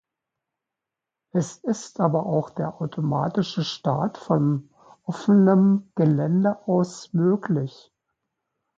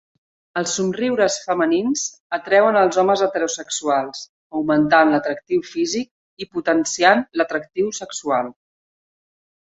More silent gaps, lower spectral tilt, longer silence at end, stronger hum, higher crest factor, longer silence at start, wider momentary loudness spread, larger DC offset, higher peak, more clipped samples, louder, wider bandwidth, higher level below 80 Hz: second, none vs 2.20-2.30 s, 4.29-4.50 s, 6.11-6.37 s; first, -7.5 dB/octave vs -3.5 dB/octave; about the same, 1.1 s vs 1.2 s; neither; about the same, 18 dB vs 18 dB; first, 1.35 s vs 0.55 s; about the same, 11 LU vs 12 LU; neither; second, -6 dBFS vs -2 dBFS; neither; second, -23 LUFS vs -19 LUFS; about the same, 7.8 kHz vs 8.2 kHz; about the same, -66 dBFS vs -62 dBFS